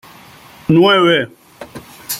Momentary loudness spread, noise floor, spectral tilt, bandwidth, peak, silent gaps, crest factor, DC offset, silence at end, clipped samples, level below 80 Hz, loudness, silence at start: 24 LU; -41 dBFS; -5 dB/octave; 16.5 kHz; 0 dBFS; none; 16 dB; under 0.1%; 0 s; under 0.1%; -54 dBFS; -12 LUFS; 0.7 s